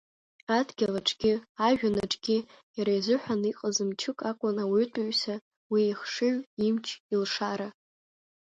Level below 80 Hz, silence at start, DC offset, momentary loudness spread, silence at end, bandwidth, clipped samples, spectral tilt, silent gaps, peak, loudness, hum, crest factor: -66 dBFS; 0.5 s; under 0.1%; 6 LU; 0.75 s; 9.2 kHz; under 0.1%; -4 dB/octave; 1.49-1.55 s, 2.63-2.74 s, 5.41-5.51 s, 5.57-5.70 s, 6.47-6.57 s, 7.00-7.09 s; -12 dBFS; -29 LUFS; none; 18 dB